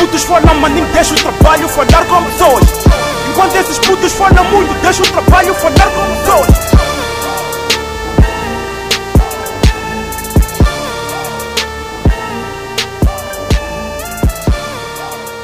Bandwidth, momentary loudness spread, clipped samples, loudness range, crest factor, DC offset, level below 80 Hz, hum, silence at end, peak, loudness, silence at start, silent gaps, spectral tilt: 16.5 kHz; 11 LU; 0.5%; 7 LU; 10 dB; under 0.1%; -16 dBFS; none; 0 s; 0 dBFS; -11 LUFS; 0 s; none; -4.5 dB/octave